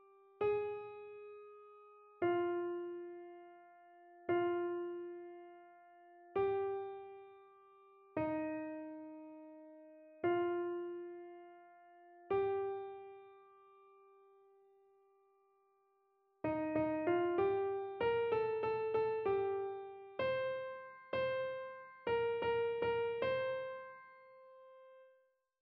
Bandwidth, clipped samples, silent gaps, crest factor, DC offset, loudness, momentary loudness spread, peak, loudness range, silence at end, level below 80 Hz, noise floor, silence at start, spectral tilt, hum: 5.2 kHz; under 0.1%; none; 16 dB; under 0.1%; -39 LUFS; 22 LU; -24 dBFS; 7 LU; 0.55 s; -74 dBFS; -77 dBFS; 0.4 s; -4.5 dB/octave; none